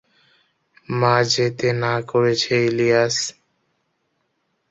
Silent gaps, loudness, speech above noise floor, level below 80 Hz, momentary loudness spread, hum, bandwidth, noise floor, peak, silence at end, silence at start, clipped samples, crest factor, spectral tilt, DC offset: none; -19 LUFS; 52 dB; -60 dBFS; 6 LU; none; 8.2 kHz; -71 dBFS; -2 dBFS; 1.4 s; 0.9 s; under 0.1%; 20 dB; -4.5 dB/octave; under 0.1%